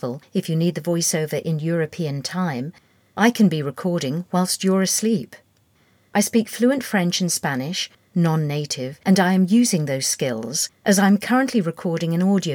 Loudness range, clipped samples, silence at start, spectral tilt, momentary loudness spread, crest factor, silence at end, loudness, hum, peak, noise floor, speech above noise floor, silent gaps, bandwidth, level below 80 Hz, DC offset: 3 LU; under 0.1%; 0.05 s; -4.5 dB/octave; 9 LU; 16 dB; 0 s; -21 LUFS; none; -4 dBFS; -60 dBFS; 40 dB; none; 19.5 kHz; -70 dBFS; under 0.1%